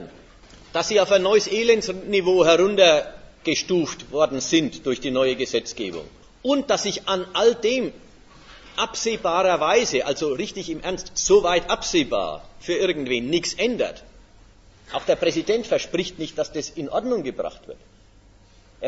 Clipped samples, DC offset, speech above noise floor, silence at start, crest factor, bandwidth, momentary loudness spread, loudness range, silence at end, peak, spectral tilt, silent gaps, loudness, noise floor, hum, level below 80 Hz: under 0.1%; under 0.1%; 30 dB; 0 s; 20 dB; 8 kHz; 12 LU; 6 LU; 0 s; -2 dBFS; -3 dB/octave; none; -22 LUFS; -52 dBFS; none; -50 dBFS